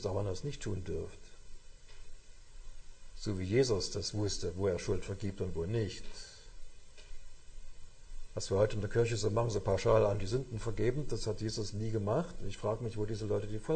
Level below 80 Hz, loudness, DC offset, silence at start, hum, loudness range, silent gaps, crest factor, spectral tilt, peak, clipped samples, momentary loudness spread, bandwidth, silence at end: -46 dBFS; -35 LUFS; under 0.1%; 0 s; none; 10 LU; none; 20 dB; -5.5 dB/octave; -14 dBFS; under 0.1%; 13 LU; 9.2 kHz; 0 s